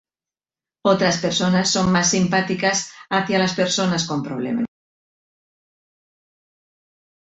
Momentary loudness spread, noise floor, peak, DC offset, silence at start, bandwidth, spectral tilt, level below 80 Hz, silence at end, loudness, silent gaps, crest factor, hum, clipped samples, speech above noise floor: 8 LU; under -90 dBFS; -4 dBFS; under 0.1%; 0.85 s; 8.2 kHz; -4 dB/octave; -54 dBFS; 2.55 s; -20 LUFS; none; 18 dB; none; under 0.1%; over 70 dB